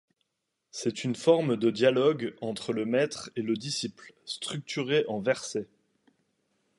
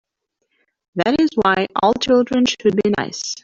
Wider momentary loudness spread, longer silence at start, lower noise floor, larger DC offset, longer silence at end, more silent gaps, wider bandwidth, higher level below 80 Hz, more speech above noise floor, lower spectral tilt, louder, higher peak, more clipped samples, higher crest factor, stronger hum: first, 13 LU vs 7 LU; second, 0.75 s vs 0.95 s; first, -82 dBFS vs -73 dBFS; neither; first, 1.15 s vs 0.05 s; neither; first, 11.5 kHz vs 7.8 kHz; second, -74 dBFS vs -52 dBFS; about the same, 54 dB vs 56 dB; about the same, -5 dB/octave vs -4.5 dB/octave; second, -29 LUFS vs -17 LUFS; second, -8 dBFS vs -2 dBFS; neither; about the same, 20 dB vs 16 dB; neither